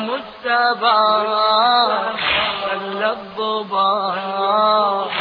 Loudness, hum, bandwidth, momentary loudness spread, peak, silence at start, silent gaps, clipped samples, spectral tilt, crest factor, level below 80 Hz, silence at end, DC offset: -17 LUFS; none; 5.2 kHz; 8 LU; -4 dBFS; 0 s; none; under 0.1%; -5.5 dB/octave; 14 dB; -56 dBFS; 0 s; under 0.1%